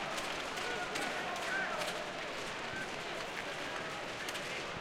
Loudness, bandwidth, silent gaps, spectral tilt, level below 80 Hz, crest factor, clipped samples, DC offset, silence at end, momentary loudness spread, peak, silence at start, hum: -38 LUFS; 16.5 kHz; none; -2.5 dB/octave; -64 dBFS; 20 dB; under 0.1%; under 0.1%; 0 s; 4 LU; -20 dBFS; 0 s; none